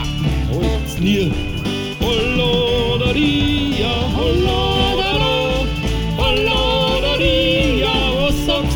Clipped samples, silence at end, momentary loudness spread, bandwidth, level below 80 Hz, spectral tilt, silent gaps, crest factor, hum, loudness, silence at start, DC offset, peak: under 0.1%; 0 s; 5 LU; 18.5 kHz; -24 dBFS; -5.5 dB/octave; none; 14 dB; none; -17 LUFS; 0 s; 0.1%; -4 dBFS